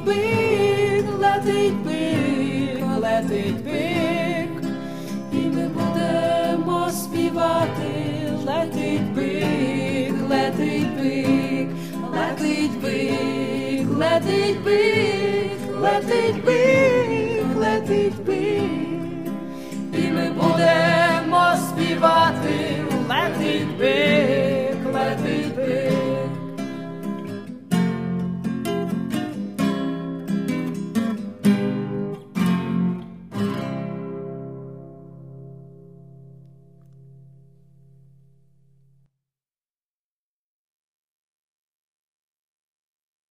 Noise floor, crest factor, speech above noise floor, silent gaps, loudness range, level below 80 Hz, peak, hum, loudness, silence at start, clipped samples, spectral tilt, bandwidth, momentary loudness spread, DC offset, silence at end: under -90 dBFS; 18 dB; over 71 dB; none; 7 LU; -58 dBFS; -4 dBFS; none; -22 LUFS; 0 s; under 0.1%; -6 dB/octave; 15.5 kHz; 12 LU; 0.5%; 7 s